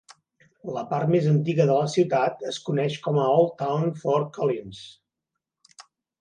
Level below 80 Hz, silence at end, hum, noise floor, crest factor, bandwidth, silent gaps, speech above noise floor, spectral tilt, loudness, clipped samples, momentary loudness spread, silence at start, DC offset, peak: -68 dBFS; 0.4 s; none; -85 dBFS; 18 dB; 9.6 kHz; none; 61 dB; -7 dB/octave; -24 LUFS; under 0.1%; 12 LU; 0.1 s; under 0.1%; -8 dBFS